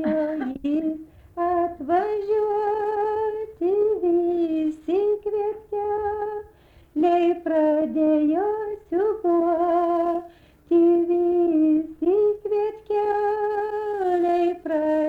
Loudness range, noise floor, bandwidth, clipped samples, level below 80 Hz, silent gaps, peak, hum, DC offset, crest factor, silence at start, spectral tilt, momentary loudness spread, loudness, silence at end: 3 LU; -52 dBFS; 4.8 kHz; under 0.1%; -56 dBFS; none; -10 dBFS; none; under 0.1%; 12 dB; 0 s; -7.5 dB/octave; 7 LU; -23 LUFS; 0 s